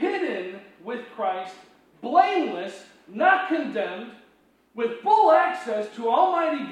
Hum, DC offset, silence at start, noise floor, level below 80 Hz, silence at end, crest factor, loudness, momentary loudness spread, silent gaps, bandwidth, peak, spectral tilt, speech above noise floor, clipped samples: none; under 0.1%; 0 s; -61 dBFS; -78 dBFS; 0 s; 20 dB; -23 LUFS; 19 LU; none; 10 kHz; -4 dBFS; -5 dB/octave; 38 dB; under 0.1%